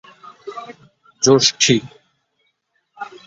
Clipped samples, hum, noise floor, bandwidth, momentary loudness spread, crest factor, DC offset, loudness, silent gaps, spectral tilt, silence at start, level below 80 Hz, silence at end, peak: under 0.1%; none; -68 dBFS; 8 kHz; 23 LU; 20 dB; under 0.1%; -14 LUFS; none; -3 dB/octave; 0.45 s; -60 dBFS; 0.2 s; -2 dBFS